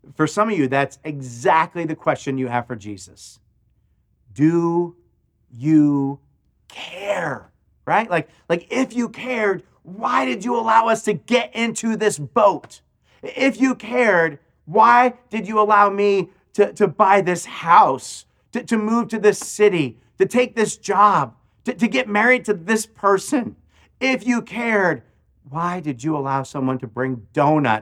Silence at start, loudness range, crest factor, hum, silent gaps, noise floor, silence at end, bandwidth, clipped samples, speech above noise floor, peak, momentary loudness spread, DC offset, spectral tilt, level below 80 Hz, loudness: 0.1 s; 6 LU; 20 dB; none; none; -62 dBFS; 0 s; 14.5 kHz; under 0.1%; 43 dB; 0 dBFS; 15 LU; under 0.1%; -5 dB/octave; -62 dBFS; -19 LUFS